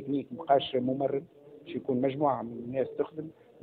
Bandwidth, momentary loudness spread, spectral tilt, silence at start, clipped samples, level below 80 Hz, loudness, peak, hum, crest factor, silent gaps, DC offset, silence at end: 4.5 kHz; 13 LU; -9.5 dB/octave; 0 s; under 0.1%; -70 dBFS; -31 LUFS; -12 dBFS; none; 20 dB; none; under 0.1%; 0.3 s